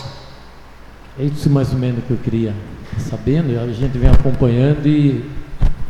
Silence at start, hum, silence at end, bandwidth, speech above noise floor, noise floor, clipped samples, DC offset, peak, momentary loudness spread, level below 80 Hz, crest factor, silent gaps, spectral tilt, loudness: 0 s; none; 0 s; 11 kHz; 23 dB; -37 dBFS; under 0.1%; under 0.1%; 0 dBFS; 14 LU; -22 dBFS; 16 dB; none; -8.5 dB/octave; -17 LUFS